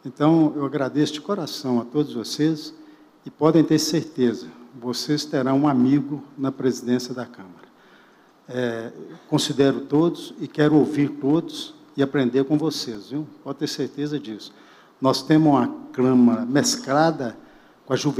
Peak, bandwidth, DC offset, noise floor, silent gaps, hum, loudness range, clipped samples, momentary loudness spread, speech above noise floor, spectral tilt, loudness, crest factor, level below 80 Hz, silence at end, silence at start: -2 dBFS; 15.5 kHz; under 0.1%; -54 dBFS; none; none; 5 LU; under 0.1%; 15 LU; 32 dB; -5.5 dB/octave; -22 LUFS; 20 dB; -66 dBFS; 0 s; 0.05 s